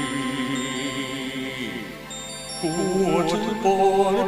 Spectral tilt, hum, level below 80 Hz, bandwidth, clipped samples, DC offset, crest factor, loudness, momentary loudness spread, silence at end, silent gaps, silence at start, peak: -4.5 dB/octave; 50 Hz at -45 dBFS; -52 dBFS; 16 kHz; under 0.1%; under 0.1%; 16 dB; -24 LUFS; 13 LU; 0 s; none; 0 s; -8 dBFS